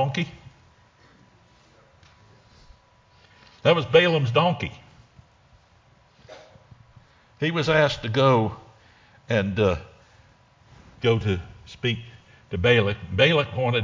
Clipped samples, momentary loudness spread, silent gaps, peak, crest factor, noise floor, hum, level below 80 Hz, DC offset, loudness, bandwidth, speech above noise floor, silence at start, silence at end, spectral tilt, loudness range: under 0.1%; 13 LU; none; -2 dBFS; 22 dB; -58 dBFS; none; -48 dBFS; under 0.1%; -22 LUFS; 7.6 kHz; 36 dB; 0 s; 0 s; -6.5 dB/octave; 6 LU